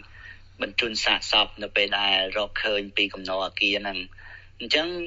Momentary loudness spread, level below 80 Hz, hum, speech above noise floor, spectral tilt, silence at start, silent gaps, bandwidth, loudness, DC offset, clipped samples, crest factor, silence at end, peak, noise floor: 12 LU; -50 dBFS; none; 20 dB; 1 dB/octave; 0 s; none; 8 kHz; -24 LUFS; under 0.1%; under 0.1%; 22 dB; 0 s; -6 dBFS; -45 dBFS